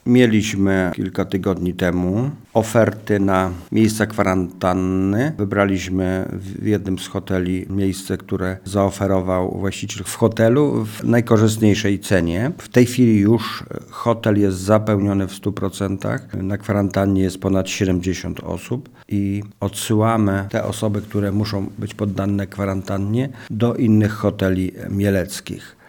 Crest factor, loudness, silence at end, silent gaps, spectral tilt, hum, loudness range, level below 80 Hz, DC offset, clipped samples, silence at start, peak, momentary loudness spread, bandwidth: 18 dB; -19 LUFS; 0.15 s; none; -6.5 dB/octave; none; 4 LU; -48 dBFS; under 0.1%; under 0.1%; 0.05 s; 0 dBFS; 9 LU; 19.5 kHz